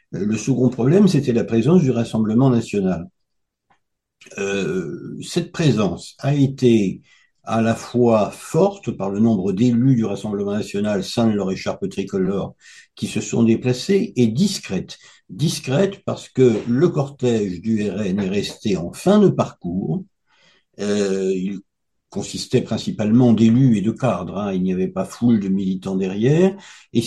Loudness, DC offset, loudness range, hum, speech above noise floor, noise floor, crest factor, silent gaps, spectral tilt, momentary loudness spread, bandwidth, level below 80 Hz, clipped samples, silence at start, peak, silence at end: -19 LUFS; under 0.1%; 5 LU; none; 57 dB; -75 dBFS; 16 dB; none; -7 dB/octave; 11 LU; 12.5 kHz; -54 dBFS; under 0.1%; 0.1 s; -2 dBFS; 0 s